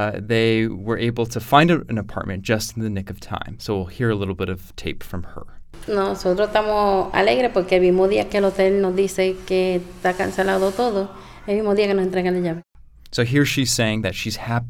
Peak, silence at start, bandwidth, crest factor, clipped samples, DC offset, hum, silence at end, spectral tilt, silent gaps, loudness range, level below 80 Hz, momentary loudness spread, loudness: 0 dBFS; 0 s; 17.5 kHz; 20 dB; under 0.1%; under 0.1%; none; 0 s; -5.5 dB/octave; none; 7 LU; -42 dBFS; 13 LU; -20 LUFS